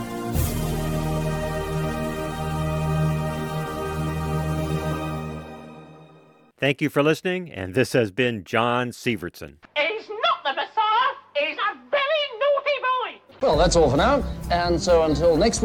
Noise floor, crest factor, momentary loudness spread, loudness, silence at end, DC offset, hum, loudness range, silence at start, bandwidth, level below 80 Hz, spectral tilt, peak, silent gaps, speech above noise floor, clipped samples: -53 dBFS; 20 dB; 10 LU; -23 LUFS; 0 s; under 0.1%; none; 6 LU; 0 s; 19.5 kHz; -36 dBFS; -5 dB/octave; -4 dBFS; none; 31 dB; under 0.1%